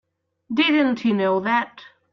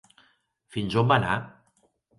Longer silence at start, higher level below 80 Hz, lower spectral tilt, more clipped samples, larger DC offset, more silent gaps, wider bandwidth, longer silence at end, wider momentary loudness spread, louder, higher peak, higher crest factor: second, 0.5 s vs 0.75 s; second, -68 dBFS vs -56 dBFS; about the same, -6.5 dB/octave vs -6.5 dB/octave; neither; neither; neither; second, 6.4 kHz vs 11.5 kHz; second, 0.3 s vs 0.7 s; second, 8 LU vs 15 LU; first, -20 LUFS vs -25 LUFS; about the same, -8 dBFS vs -6 dBFS; second, 14 dB vs 22 dB